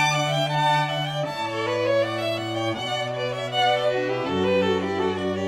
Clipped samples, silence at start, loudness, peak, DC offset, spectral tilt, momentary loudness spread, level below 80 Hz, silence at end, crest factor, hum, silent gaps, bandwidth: under 0.1%; 0 s; -24 LUFS; -10 dBFS; under 0.1%; -4.5 dB/octave; 6 LU; -62 dBFS; 0 s; 14 dB; none; none; 16 kHz